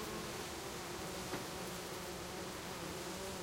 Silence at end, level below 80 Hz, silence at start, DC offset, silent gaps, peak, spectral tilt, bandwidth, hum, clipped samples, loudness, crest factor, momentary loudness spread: 0 s; -62 dBFS; 0 s; under 0.1%; none; -28 dBFS; -3.5 dB/octave; 16 kHz; none; under 0.1%; -44 LUFS; 16 dB; 2 LU